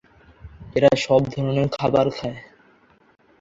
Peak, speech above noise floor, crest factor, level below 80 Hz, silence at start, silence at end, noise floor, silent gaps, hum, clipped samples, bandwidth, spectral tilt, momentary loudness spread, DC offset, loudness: -2 dBFS; 37 dB; 20 dB; -50 dBFS; 0.45 s; 1 s; -56 dBFS; none; none; under 0.1%; 7.8 kHz; -6.5 dB/octave; 13 LU; under 0.1%; -21 LUFS